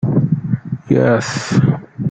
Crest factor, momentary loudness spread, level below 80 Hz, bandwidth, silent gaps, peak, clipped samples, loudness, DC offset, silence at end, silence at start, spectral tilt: 14 dB; 8 LU; -48 dBFS; 9 kHz; none; -2 dBFS; under 0.1%; -16 LUFS; under 0.1%; 0 s; 0 s; -7 dB/octave